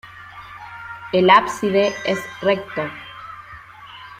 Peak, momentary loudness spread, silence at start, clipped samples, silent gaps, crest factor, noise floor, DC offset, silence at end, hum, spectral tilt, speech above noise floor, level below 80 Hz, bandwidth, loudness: -2 dBFS; 25 LU; 0.05 s; under 0.1%; none; 20 dB; -40 dBFS; under 0.1%; 0.05 s; none; -5 dB/octave; 22 dB; -58 dBFS; 15.5 kHz; -18 LUFS